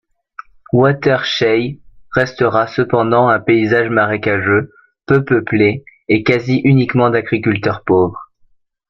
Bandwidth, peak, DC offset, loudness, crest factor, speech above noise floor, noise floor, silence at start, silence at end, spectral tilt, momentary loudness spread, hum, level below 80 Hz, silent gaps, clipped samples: 7 kHz; 0 dBFS; under 0.1%; -14 LUFS; 14 dB; 41 dB; -54 dBFS; 0.75 s; 0.65 s; -7.5 dB/octave; 6 LU; none; -48 dBFS; none; under 0.1%